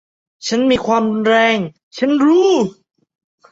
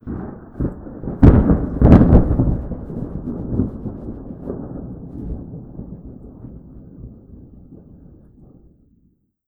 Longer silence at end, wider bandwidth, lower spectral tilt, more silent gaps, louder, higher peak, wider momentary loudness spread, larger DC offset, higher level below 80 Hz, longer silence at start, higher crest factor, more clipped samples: second, 0.8 s vs 1.75 s; first, 8 kHz vs 4.3 kHz; second, -5 dB/octave vs -11.5 dB/octave; first, 1.83-1.91 s vs none; about the same, -15 LUFS vs -17 LUFS; about the same, -2 dBFS vs 0 dBFS; second, 10 LU vs 27 LU; neither; second, -54 dBFS vs -24 dBFS; first, 0.4 s vs 0.05 s; second, 14 dB vs 20 dB; second, under 0.1% vs 0.1%